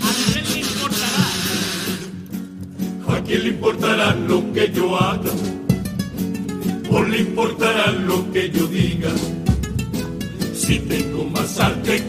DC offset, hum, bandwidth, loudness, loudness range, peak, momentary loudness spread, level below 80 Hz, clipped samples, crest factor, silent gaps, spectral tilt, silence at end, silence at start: under 0.1%; none; 15.5 kHz; -20 LUFS; 2 LU; -2 dBFS; 8 LU; -38 dBFS; under 0.1%; 18 dB; none; -4.5 dB/octave; 0 s; 0 s